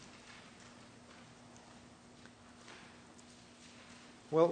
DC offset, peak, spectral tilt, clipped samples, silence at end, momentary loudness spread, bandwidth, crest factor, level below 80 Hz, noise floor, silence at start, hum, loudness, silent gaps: under 0.1%; -16 dBFS; -6 dB/octave; under 0.1%; 0 s; 4 LU; 9.4 kHz; 26 dB; -76 dBFS; -58 dBFS; 2.7 s; none; -44 LUFS; none